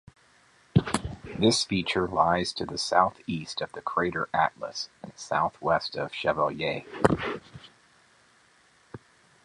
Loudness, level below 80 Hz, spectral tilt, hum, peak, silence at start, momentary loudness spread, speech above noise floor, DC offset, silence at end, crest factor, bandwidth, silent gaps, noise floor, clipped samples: -27 LUFS; -52 dBFS; -4.5 dB/octave; none; -4 dBFS; 0.75 s; 11 LU; 34 dB; under 0.1%; 0.5 s; 26 dB; 11.5 kHz; none; -61 dBFS; under 0.1%